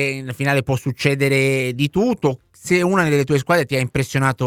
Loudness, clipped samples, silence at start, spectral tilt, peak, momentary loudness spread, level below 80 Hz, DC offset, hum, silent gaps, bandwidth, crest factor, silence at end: -19 LUFS; under 0.1%; 0 s; -6 dB/octave; -2 dBFS; 6 LU; -48 dBFS; under 0.1%; none; none; 16.5 kHz; 16 dB; 0 s